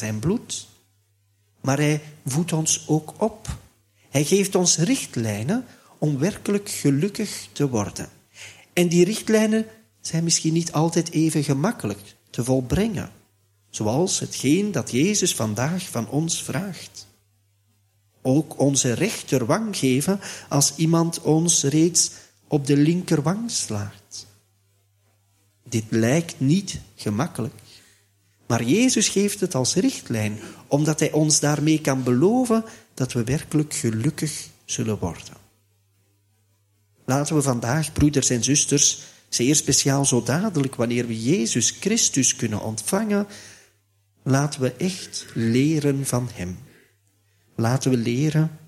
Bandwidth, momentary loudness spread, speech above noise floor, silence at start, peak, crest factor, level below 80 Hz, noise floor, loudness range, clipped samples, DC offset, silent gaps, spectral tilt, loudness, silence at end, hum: 15.5 kHz; 13 LU; 43 dB; 0 s; -4 dBFS; 20 dB; -52 dBFS; -64 dBFS; 6 LU; under 0.1%; under 0.1%; none; -4.5 dB/octave; -22 LUFS; 0.1 s; none